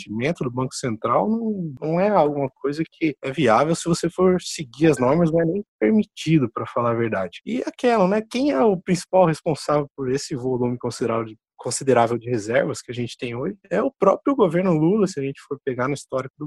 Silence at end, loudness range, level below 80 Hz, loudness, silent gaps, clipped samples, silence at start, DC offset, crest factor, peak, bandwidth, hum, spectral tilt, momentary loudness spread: 0 s; 3 LU; -56 dBFS; -22 LUFS; 5.68-5.79 s, 16.30-16.34 s; under 0.1%; 0 s; under 0.1%; 18 dB; -4 dBFS; 12.5 kHz; none; -6 dB/octave; 9 LU